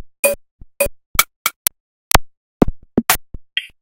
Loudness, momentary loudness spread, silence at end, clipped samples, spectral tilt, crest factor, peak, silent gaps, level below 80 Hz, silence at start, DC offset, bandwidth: -19 LUFS; 8 LU; 0.15 s; 0.1%; -3 dB/octave; 20 dB; 0 dBFS; 0.19-0.23 s, 0.51-0.59 s, 1.06-1.14 s, 1.36-1.45 s, 1.56-1.65 s, 1.80-2.11 s, 2.37-2.60 s; -30 dBFS; 0 s; under 0.1%; 18 kHz